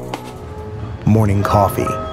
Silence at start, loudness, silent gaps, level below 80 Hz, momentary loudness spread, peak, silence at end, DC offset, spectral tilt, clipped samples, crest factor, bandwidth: 0 s; -16 LUFS; none; -34 dBFS; 16 LU; 0 dBFS; 0 s; under 0.1%; -7.5 dB/octave; under 0.1%; 18 dB; 16 kHz